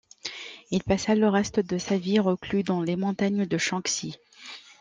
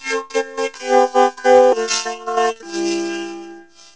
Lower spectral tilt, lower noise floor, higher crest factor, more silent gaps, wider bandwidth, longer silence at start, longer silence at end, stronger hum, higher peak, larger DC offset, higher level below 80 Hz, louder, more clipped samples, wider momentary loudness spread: first, -5 dB/octave vs -2 dB/octave; first, -46 dBFS vs -40 dBFS; about the same, 16 dB vs 18 dB; neither; first, 9.8 kHz vs 8 kHz; first, 0.25 s vs 0 s; second, 0.2 s vs 0.35 s; neither; second, -10 dBFS vs 0 dBFS; second, under 0.1% vs 0.3%; first, -56 dBFS vs -62 dBFS; second, -26 LUFS vs -17 LUFS; neither; first, 17 LU vs 13 LU